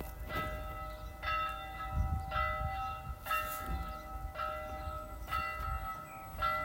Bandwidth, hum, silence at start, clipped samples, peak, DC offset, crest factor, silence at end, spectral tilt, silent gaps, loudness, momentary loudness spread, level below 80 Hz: 16.5 kHz; none; 0 s; under 0.1%; -22 dBFS; under 0.1%; 16 dB; 0 s; -5 dB/octave; none; -39 LUFS; 9 LU; -44 dBFS